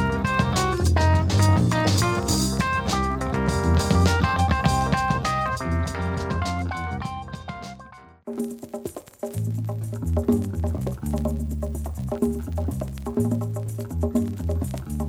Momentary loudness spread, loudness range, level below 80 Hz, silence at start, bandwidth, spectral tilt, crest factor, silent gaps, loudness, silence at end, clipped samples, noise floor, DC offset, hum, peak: 13 LU; 9 LU; -32 dBFS; 0 s; 17.5 kHz; -5.5 dB/octave; 16 dB; none; -24 LUFS; 0 s; under 0.1%; -46 dBFS; under 0.1%; none; -6 dBFS